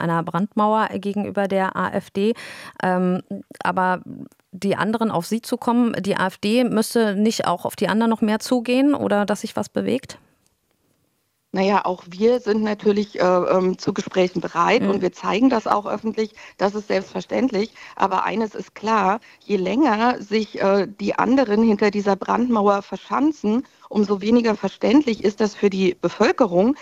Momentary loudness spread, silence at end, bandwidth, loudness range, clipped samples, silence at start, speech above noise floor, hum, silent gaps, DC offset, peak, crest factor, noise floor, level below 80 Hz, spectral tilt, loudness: 8 LU; 0 s; 14.5 kHz; 4 LU; under 0.1%; 0 s; 49 dB; none; none; under 0.1%; -2 dBFS; 20 dB; -69 dBFS; -60 dBFS; -6 dB/octave; -21 LUFS